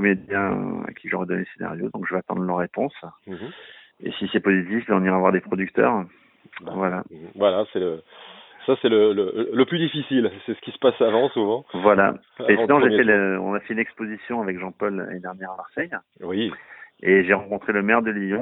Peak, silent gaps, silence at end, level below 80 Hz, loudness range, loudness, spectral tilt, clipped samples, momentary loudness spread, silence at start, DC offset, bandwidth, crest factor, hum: 0 dBFS; none; 0 s; -64 dBFS; 9 LU; -22 LUFS; -10.5 dB/octave; under 0.1%; 16 LU; 0 s; under 0.1%; 4.1 kHz; 22 dB; none